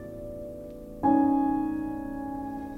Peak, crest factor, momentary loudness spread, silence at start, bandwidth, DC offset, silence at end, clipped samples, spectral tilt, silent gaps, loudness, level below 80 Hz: -12 dBFS; 16 dB; 17 LU; 0 s; 3.6 kHz; under 0.1%; 0 s; under 0.1%; -9 dB/octave; none; -27 LUFS; -50 dBFS